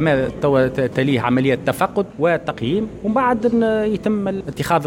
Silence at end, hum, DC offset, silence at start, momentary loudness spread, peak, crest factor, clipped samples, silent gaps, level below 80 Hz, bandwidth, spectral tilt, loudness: 0 s; none; under 0.1%; 0 s; 5 LU; -4 dBFS; 14 dB; under 0.1%; none; -44 dBFS; 17 kHz; -7 dB/octave; -19 LUFS